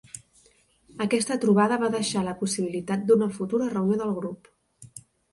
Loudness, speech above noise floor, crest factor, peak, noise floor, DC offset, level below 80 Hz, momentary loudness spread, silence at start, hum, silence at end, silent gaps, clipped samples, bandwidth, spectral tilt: -25 LUFS; 37 dB; 18 dB; -8 dBFS; -62 dBFS; under 0.1%; -64 dBFS; 23 LU; 0.15 s; none; 0.3 s; none; under 0.1%; 11.5 kHz; -5 dB/octave